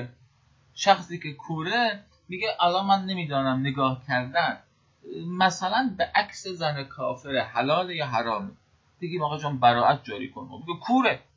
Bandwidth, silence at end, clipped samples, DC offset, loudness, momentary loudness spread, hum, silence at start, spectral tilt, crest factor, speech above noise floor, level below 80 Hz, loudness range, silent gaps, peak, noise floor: 7.8 kHz; 0.2 s; under 0.1%; under 0.1%; -26 LUFS; 15 LU; none; 0 s; -5 dB/octave; 22 dB; 36 dB; -62 dBFS; 2 LU; none; -6 dBFS; -62 dBFS